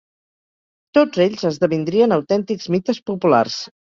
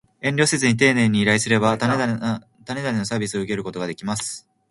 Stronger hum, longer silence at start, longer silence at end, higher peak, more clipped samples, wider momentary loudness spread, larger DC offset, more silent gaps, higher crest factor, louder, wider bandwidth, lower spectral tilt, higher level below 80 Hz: neither; first, 0.95 s vs 0.25 s; about the same, 0.2 s vs 0.3 s; about the same, -2 dBFS vs -4 dBFS; neither; second, 5 LU vs 12 LU; neither; first, 3.02-3.06 s vs none; about the same, 16 dB vs 18 dB; first, -18 LUFS vs -21 LUFS; second, 7.4 kHz vs 11.5 kHz; first, -6 dB/octave vs -4.5 dB/octave; about the same, -60 dBFS vs -56 dBFS